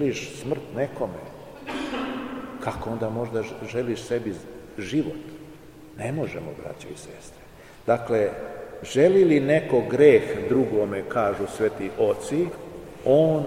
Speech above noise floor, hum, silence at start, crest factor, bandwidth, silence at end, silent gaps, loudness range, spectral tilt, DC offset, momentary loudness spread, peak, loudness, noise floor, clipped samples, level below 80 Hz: 22 dB; none; 0 s; 20 dB; 15.5 kHz; 0 s; none; 11 LU; -6.5 dB/octave; 0.2%; 20 LU; -4 dBFS; -24 LUFS; -45 dBFS; under 0.1%; -54 dBFS